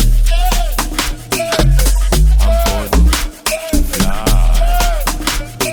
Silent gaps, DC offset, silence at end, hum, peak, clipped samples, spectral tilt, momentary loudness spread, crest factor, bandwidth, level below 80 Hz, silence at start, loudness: none; under 0.1%; 0 s; none; 0 dBFS; under 0.1%; -4 dB/octave; 5 LU; 12 dB; 19.5 kHz; -12 dBFS; 0 s; -15 LUFS